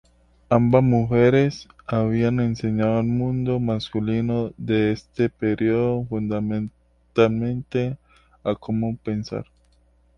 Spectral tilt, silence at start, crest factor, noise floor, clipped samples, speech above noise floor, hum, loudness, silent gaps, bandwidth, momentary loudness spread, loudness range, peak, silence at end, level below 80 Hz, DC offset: -8.5 dB/octave; 0.5 s; 20 dB; -59 dBFS; under 0.1%; 38 dB; none; -22 LUFS; none; 6.8 kHz; 11 LU; 5 LU; -2 dBFS; 0.75 s; -48 dBFS; under 0.1%